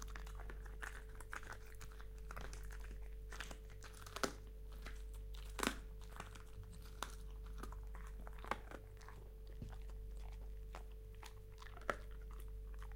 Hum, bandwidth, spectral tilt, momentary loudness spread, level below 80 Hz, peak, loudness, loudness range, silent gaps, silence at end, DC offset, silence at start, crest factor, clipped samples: none; 16.5 kHz; -4 dB/octave; 11 LU; -52 dBFS; -18 dBFS; -51 LUFS; 5 LU; none; 0 s; under 0.1%; 0 s; 30 dB; under 0.1%